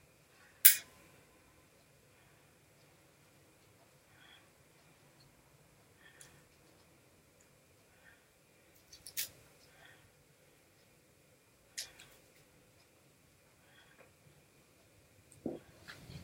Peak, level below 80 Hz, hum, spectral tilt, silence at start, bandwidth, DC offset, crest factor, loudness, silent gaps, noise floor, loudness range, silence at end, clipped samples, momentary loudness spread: -2 dBFS; -76 dBFS; none; 0 dB/octave; 0.65 s; 16 kHz; under 0.1%; 40 dB; -30 LUFS; none; -67 dBFS; 24 LU; 0.05 s; under 0.1%; 35 LU